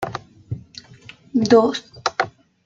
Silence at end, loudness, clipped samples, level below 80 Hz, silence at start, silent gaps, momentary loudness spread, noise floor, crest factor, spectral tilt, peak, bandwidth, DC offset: 0.35 s; -20 LUFS; under 0.1%; -58 dBFS; 0 s; none; 20 LU; -45 dBFS; 20 dB; -5 dB/octave; -2 dBFS; 7.8 kHz; under 0.1%